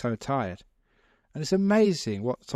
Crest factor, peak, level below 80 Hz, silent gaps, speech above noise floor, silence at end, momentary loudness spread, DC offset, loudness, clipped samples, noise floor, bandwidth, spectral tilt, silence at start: 16 dB; -12 dBFS; -60 dBFS; none; 40 dB; 0 s; 16 LU; under 0.1%; -26 LUFS; under 0.1%; -66 dBFS; 12.5 kHz; -6 dB/octave; 0 s